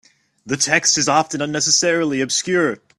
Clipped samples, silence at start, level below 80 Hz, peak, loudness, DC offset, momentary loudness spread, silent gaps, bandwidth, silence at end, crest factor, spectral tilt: under 0.1%; 0.45 s; -60 dBFS; 0 dBFS; -17 LUFS; under 0.1%; 6 LU; none; 13 kHz; 0.2 s; 18 dB; -2 dB/octave